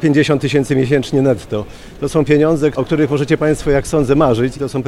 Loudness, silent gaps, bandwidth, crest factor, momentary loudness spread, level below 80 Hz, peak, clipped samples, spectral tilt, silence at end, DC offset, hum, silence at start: -15 LUFS; none; 13 kHz; 14 dB; 7 LU; -34 dBFS; 0 dBFS; under 0.1%; -6.5 dB/octave; 0 s; under 0.1%; none; 0 s